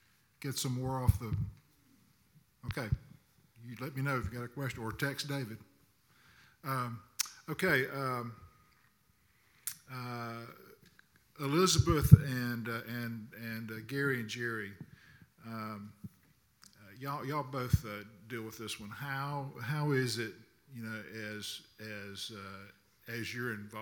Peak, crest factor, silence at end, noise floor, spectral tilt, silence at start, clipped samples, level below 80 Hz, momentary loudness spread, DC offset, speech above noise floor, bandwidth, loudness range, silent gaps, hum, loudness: -4 dBFS; 32 dB; 0 s; -71 dBFS; -5 dB/octave; 0.4 s; under 0.1%; -50 dBFS; 17 LU; under 0.1%; 36 dB; 19 kHz; 12 LU; none; none; -35 LUFS